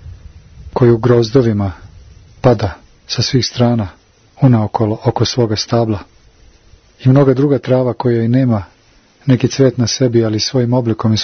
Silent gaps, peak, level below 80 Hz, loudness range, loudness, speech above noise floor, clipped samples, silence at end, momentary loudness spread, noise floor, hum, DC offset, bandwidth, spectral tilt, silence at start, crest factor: none; 0 dBFS; -42 dBFS; 2 LU; -14 LUFS; 36 dB; under 0.1%; 0 s; 8 LU; -49 dBFS; none; under 0.1%; 6.6 kHz; -6.5 dB/octave; 0.05 s; 14 dB